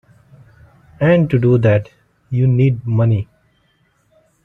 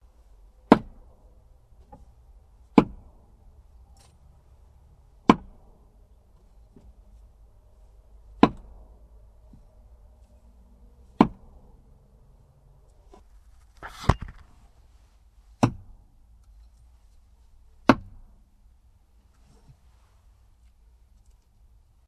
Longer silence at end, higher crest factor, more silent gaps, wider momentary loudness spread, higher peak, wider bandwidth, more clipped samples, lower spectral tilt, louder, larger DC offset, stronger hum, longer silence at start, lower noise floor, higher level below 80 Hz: second, 1.2 s vs 4.1 s; second, 16 dB vs 30 dB; neither; second, 7 LU vs 24 LU; about the same, -2 dBFS vs -2 dBFS; second, 4.1 kHz vs 12 kHz; neither; first, -10.5 dB/octave vs -7 dB/octave; first, -15 LUFS vs -24 LUFS; neither; neither; first, 1 s vs 0.7 s; about the same, -60 dBFS vs -58 dBFS; about the same, -48 dBFS vs -46 dBFS